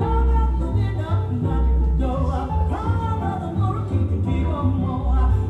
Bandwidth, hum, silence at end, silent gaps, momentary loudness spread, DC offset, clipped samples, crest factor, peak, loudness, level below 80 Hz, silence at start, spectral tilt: 4.2 kHz; none; 0 s; none; 3 LU; under 0.1%; under 0.1%; 12 dB; -8 dBFS; -22 LUFS; -24 dBFS; 0 s; -9.5 dB/octave